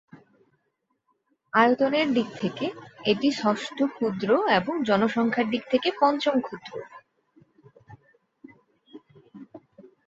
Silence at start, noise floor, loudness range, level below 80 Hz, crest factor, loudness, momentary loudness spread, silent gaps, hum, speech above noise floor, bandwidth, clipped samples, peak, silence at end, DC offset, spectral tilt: 0.15 s; -76 dBFS; 6 LU; -68 dBFS; 22 dB; -24 LUFS; 10 LU; none; none; 51 dB; 8 kHz; under 0.1%; -4 dBFS; 0.25 s; under 0.1%; -5.5 dB/octave